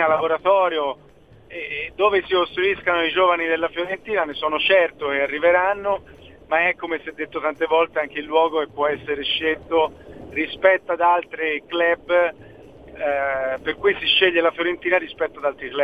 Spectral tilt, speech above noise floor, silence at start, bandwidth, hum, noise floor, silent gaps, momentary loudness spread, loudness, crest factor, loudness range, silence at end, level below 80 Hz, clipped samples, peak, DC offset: -5.5 dB/octave; 22 dB; 0 s; 5 kHz; none; -43 dBFS; none; 10 LU; -21 LUFS; 20 dB; 2 LU; 0 s; -54 dBFS; under 0.1%; -2 dBFS; 0.1%